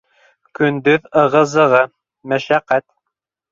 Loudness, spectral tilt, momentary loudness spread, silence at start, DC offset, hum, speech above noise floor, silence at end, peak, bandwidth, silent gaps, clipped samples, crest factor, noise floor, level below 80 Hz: -15 LUFS; -6 dB/octave; 8 LU; 0.6 s; under 0.1%; none; 64 dB; 0.7 s; -2 dBFS; 7.6 kHz; none; under 0.1%; 16 dB; -79 dBFS; -60 dBFS